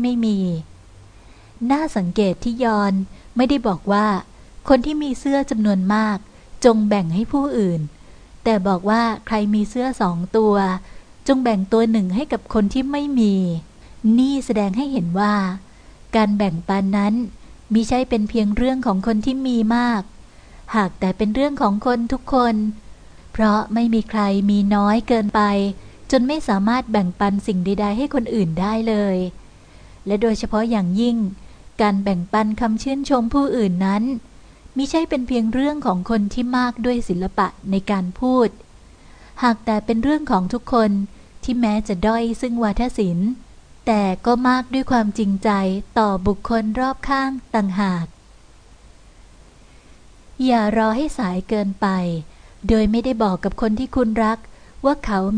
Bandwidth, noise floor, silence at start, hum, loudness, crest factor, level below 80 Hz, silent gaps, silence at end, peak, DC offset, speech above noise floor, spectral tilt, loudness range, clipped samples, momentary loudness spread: 10 kHz; -47 dBFS; 0 s; none; -20 LUFS; 18 dB; -38 dBFS; none; 0 s; -2 dBFS; under 0.1%; 28 dB; -7 dB/octave; 3 LU; under 0.1%; 7 LU